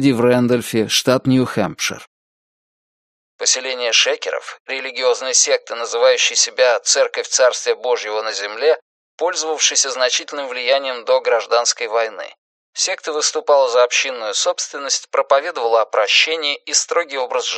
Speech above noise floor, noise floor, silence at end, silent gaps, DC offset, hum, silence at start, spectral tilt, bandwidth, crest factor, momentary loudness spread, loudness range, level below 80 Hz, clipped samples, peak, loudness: over 73 dB; under -90 dBFS; 0 s; 2.07-3.39 s, 4.60-4.65 s, 8.82-9.18 s, 12.38-12.73 s; under 0.1%; none; 0 s; -2 dB/octave; 13 kHz; 18 dB; 9 LU; 4 LU; -66 dBFS; under 0.1%; 0 dBFS; -17 LUFS